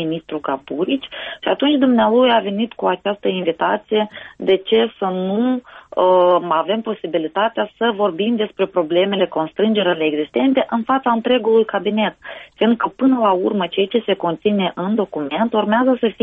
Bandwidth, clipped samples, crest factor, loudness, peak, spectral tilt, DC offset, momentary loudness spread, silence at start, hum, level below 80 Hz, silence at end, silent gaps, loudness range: 3.9 kHz; under 0.1%; 14 dB; -18 LUFS; -4 dBFS; -8.5 dB/octave; under 0.1%; 8 LU; 0 s; none; -62 dBFS; 0.1 s; none; 2 LU